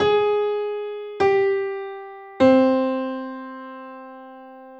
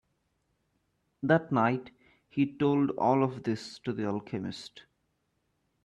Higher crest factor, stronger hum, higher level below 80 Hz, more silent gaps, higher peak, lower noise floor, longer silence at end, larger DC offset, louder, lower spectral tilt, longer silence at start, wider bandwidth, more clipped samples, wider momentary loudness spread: about the same, 18 dB vs 20 dB; neither; first, -62 dBFS vs -70 dBFS; neither; first, -4 dBFS vs -12 dBFS; second, -42 dBFS vs -77 dBFS; second, 0 s vs 1.05 s; neither; first, -21 LUFS vs -30 LUFS; about the same, -6.5 dB/octave vs -7.5 dB/octave; second, 0 s vs 1.2 s; second, 8 kHz vs 10.5 kHz; neither; first, 22 LU vs 11 LU